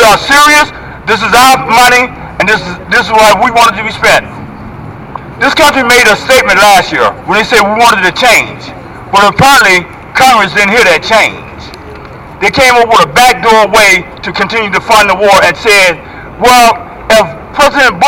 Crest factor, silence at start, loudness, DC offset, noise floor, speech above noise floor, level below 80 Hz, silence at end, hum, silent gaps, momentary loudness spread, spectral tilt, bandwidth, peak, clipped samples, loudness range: 6 dB; 0 s; -5 LUFS; under 0.1%; -26 dBFS; 20 dB; -32 dBFS; 0 s; none; none; 19 LU; -2.5 dB/octave; 18 kHz; 0 dBFS; under 0.1%; 2 LU